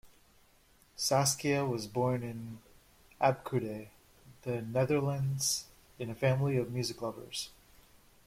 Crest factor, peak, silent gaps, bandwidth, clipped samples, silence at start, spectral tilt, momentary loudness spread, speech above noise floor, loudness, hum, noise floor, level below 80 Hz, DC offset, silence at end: 20 dB; -14 dBFS; none; 16 kHz; under 0.1%; 0.05 s; -4.5 dB/octave; 16 LU; 32 dB; -33 LUFS; none; -65 dBFS; -64 dBFS; under 0.1%; 0.75 s